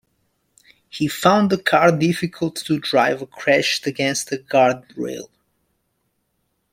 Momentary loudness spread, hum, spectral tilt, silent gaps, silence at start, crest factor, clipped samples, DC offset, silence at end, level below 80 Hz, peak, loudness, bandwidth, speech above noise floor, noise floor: 13 LU; none; -4.5 dB/octave; none; 0.95 s; 20 dB; under 0.1%; under 0.1%; 1.45 s; -60 dBFS; -2 dBFS; -19 LUFS; 16.5 kHz; 52 dB; -71 dBFS